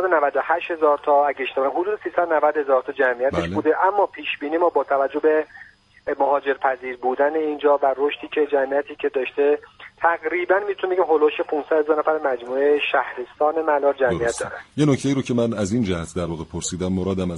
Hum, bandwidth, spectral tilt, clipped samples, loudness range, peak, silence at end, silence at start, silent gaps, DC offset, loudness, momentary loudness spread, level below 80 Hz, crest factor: none; 11.5 kHz; -5.5 dB/octave; under 0.1%; 2 LU; -4 dBFS; 0 s; 0 s; none; under 0.1%; -21 LUFS; 7 LU; -52 dBFS; 18 dB